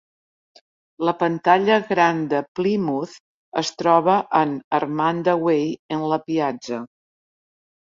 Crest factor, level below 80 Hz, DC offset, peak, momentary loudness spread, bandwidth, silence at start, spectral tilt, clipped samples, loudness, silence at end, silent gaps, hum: 18 dB; -66 dBFS; under 0.1%; -2 dBFS; 11 LU; 7.6 kHz; 1 s; -5.5 dB/octave; under 0.1%; -21 LUFS; 1.1 s; 2.48-2.55 s, 3.20-3.52 s, 4.64-4.71 s, 5.79-5.89 s; none